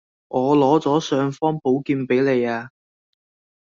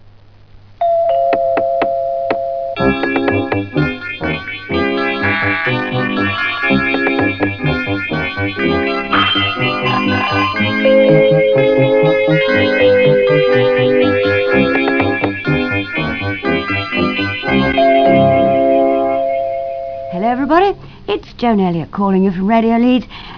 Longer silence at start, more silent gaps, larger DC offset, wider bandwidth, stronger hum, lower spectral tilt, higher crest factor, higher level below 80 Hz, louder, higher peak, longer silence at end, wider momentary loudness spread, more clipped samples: second, 0.3 s vs 0.55 s; neither; second, under 0.1% vs 0.5%; first, 7.4 kHz vs 5.4 kHz; neither; about the same, -6.5 dB/octave vs -7.5 dB/octave; about the same, 18 dB vs 14 dB; second, -64 dBFS vs -40 dBFS; second, -20 LUFS vs -14 LUFS; second, -4 dBFS vs 0 dBFS; first, 0.95 s vs 0 s; about the same, 8 LU vs 8 LU; neither